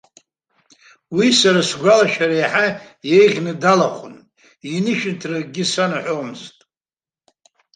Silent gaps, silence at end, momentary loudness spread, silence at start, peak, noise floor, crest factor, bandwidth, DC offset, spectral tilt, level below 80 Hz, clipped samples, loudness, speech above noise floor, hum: none; 1.25 s; 14 LU; 1.1 s; -2 dBFS; under -90 dBFS; 16 dB; 9.8 kHz; under 0.1%; -4 dB/octave; -64 dBFS; under 0.1%; -17 LUFS; over 73 dB; none